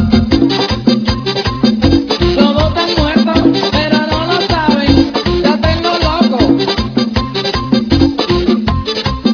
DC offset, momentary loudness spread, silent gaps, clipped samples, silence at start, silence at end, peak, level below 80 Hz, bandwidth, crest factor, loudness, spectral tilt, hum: under 0.1%; 4 LU; none; 0.3%; 0 s; 0 s; 0 dBFS; -24 dBFS; 5.4 kHz; 12 dB; -12 LUFS; -6.5 dB/octave; none